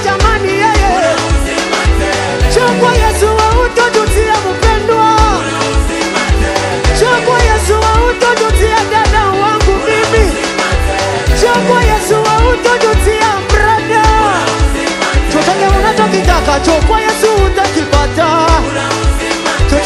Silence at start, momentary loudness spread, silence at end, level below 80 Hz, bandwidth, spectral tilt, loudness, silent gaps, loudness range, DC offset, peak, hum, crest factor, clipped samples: 0 s; 4 LU; 0 s; -16 dBFS; 14.5 kHz; -4.5 dB/octave; -10 LUFS; none; 1 LU; under 0.1%; 0 dBFS; none; 10 dB; 0.2%